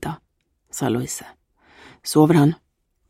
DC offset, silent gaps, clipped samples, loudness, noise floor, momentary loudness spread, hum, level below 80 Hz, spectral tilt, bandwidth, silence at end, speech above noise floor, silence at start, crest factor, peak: under 0.1%; none; under 0.1%; -19 LUFS; -69 dBFS; 20 LU; none; -56 dBFS; -6 dB/octave; 16 kHz; 0.55 s; 51 dB; 0 s; 20 dB; -2 dBFS